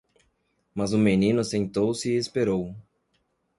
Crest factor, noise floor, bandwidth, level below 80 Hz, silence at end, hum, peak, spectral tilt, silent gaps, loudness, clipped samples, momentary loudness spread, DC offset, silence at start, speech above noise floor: 18 dB; -72 dBFS; 11.5 kHz; -56 dBFS; 0.75 s; none; -8 dBFS; -6 dB/octave; none; -25 LUFS; under 0.1%; 10 LU; under 0.1%; 0.75 s; 48 dB